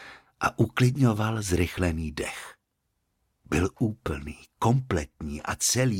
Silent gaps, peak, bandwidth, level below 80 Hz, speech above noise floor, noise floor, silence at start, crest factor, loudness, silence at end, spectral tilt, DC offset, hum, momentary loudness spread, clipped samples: none; -10 dBFS; 16.5 kHz; -44 dBFS; 51 dB; -77 dBFS; 0 s; 18 dB; -27 LUFS; 0 s; -5 dB/octave; under 0.1%; none; 13 LU; under 0.1%